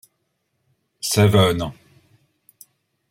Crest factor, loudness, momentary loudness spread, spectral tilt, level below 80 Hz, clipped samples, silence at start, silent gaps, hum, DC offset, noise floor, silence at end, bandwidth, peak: 20 dB; -18 LUFS; 14 LU; -5 dB/octave; -52 dBFS; under 0.1%; 1.05 s; none; none; under 0.1%; -72 dBFS; 1.4 s; 16 kHz; -2 dBFS